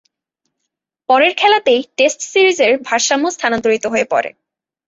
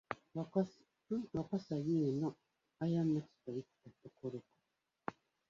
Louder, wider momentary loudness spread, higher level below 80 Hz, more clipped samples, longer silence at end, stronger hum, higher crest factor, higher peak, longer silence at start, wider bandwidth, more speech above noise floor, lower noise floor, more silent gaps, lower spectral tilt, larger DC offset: first, -14 LUFS vs -40 LUFS; second, 6 LU vs 14 LU; first, -60 dBFS vs -74 dBFS; neither; first, 0.6 s vs 0.4 s; neither; about the same, 16 dB vs 20 dB; first, 0 dBFS vs -20 dBFS; first, 1.1 s vs 0.1 s; about the same, 8 kHz vs 7.4 kHz; first, 62 dB vs 47 dB; second, -76 dBFS vs -86 dBFS; neither; second, -1.5 dB/octave vs -8.5 dB/octave; neither